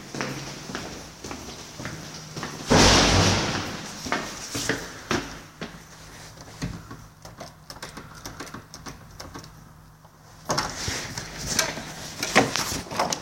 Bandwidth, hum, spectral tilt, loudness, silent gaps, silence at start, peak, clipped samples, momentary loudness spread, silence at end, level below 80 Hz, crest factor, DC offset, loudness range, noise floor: 16.5 kHz; none; -3 dB/octave; -25 LUFS; none; 0 s; 0 dBFS; under 0.1%; 22 LU; 0 s; -42 dBFS; 26 dB; under 0.1%; 17 LU; -50 dBFS